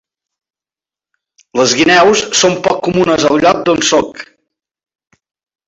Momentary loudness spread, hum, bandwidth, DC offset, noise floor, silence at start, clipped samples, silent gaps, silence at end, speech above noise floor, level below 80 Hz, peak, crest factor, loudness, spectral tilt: 8 LU; none; 8.2 kHz; under 0.1%; under -90 dBFS; 1.55 s; under 0.1%; none; 1.45 s; over 79 dB; -48 dBFS; 0 dBFS; 14 dB; -11 LUFS; -3 dB/octave